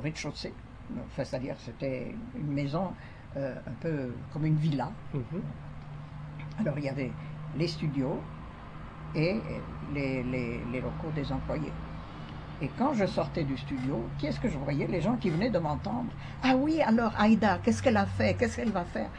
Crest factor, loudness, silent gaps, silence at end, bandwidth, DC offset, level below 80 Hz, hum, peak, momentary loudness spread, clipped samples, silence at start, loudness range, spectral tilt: 20 dB; -31 LUFS; none; 0 s; 10 kHz; under 0.1%; -48 dBFS; none; -12 dBFS; 16 LU; under 0.1%; 0 s; 8 LU; -7 dB/octave